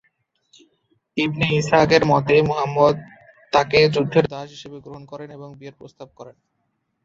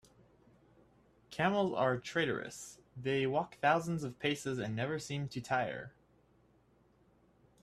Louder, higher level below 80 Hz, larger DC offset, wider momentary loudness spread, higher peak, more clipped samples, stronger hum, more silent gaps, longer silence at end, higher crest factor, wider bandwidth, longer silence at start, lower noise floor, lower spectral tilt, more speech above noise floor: first, -18 LUFS vs -35 LUFS; first, -52 dBFS vs -70 dBFS; neither; first, 23 LU vs 14 LU; first, -2 dBFS vs -16 dBFS; neither; neither; neither; second, 0.75 s vs 1.75 s; about the same, 20 dB vs 22 dB; second, 7.8 kHz vs 14 kHz; second, 1.15 s vs 1.3 s; about the same, -72 dBFS vs -69 dBFS; about the same, -6 dB/octave vs -5.5 dB/octave; first, 53 dB vs 34 dB